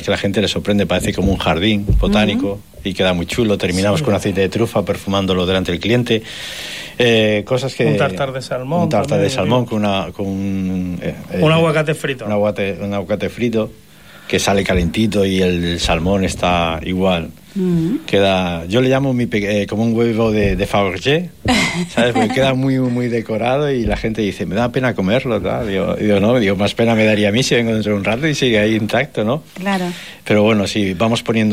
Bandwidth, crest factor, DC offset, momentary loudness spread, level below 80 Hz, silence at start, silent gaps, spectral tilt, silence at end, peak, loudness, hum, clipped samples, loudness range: 16 kHz; 12 dB; 0.5%; 7 LU; -34 dBFS; 0 s; none; -5.5 dB/octave; 0 s; -4 dBFS; -17 LUFS; none; under 0.1%; 3 LU